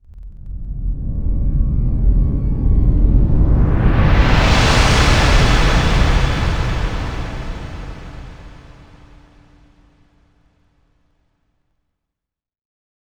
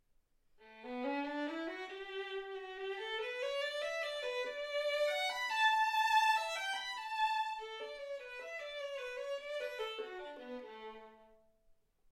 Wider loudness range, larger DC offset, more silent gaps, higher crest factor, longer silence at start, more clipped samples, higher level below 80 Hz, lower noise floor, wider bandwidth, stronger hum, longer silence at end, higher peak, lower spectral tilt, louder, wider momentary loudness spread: first, 16 LU vs 10 LU; neither; neither; about the same, 16 dB vs 20 dB; second, 0.15 s vs 0.6 s; neither; first, -18 dBFS vs -76 dBFS; first, -83 dBFS vs -73 dBFS; second, 11 kHz vs 16.5 kHz; neither; first, 4.65 s vs 0.85 s; first, 0 dBFS vs -20 dBFS; first, -5.5 dB/octave vs -0.5 dB/octave; first, -16 LUFS vs -37 LUFS; first, 19 LU vs 16 LU